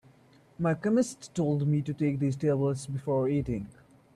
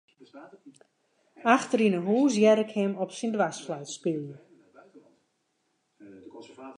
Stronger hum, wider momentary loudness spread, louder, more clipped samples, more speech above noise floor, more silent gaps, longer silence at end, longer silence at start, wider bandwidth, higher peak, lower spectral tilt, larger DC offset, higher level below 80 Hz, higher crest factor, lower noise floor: neither; second, 7 LU vs 22 LU; second, -29 LUFS vs -26 LUFS; neither; second, 31 dB vs 49 dB; neither; first, 0.45 s vs 0.05 s; first, 0.6 s vs 0.35 s; about the same, 12 kHz vs 11 kHz; second, -14 dBFS vs -6 dBFS; first, -7.5 dB/octave vs -5.5 dB/octave; neither; first, -56 dBFS vs -80 dBFS; second, 14 dB vs 22 dB; second, -59 dBFS vs -75 dBFS